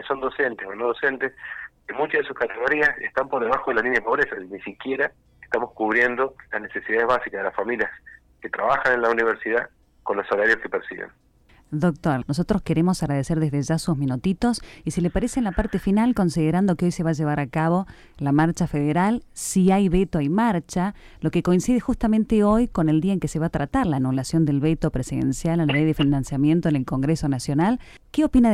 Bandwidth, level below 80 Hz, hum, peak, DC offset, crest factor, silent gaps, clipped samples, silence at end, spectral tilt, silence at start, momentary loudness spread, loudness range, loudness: 14.5 kHz; -42 dBFS; none; -8 dBFS; under 0.1%; 16 dB; none; under 0.1%; 0 s; -6.5 dB/octave; 0 s; 9 LU; 3 LU; -23 LUFS